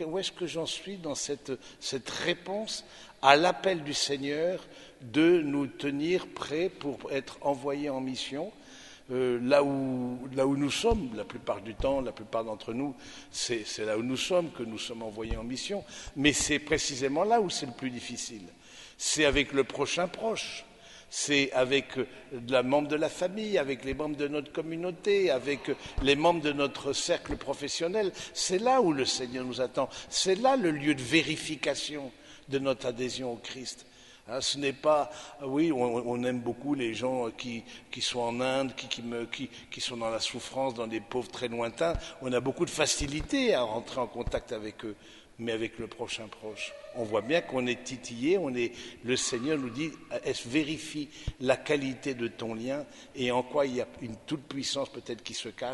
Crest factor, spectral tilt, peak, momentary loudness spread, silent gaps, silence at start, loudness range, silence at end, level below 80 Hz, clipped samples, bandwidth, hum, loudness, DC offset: 28 dB; -3.5 dB/octave; -2 dBFS; 13 LU; none; 0 s; 5 LU; 0 s; -52 dBFS; under 0.1%; 11.5 kHz; none; -31 LUFS; under 0.1%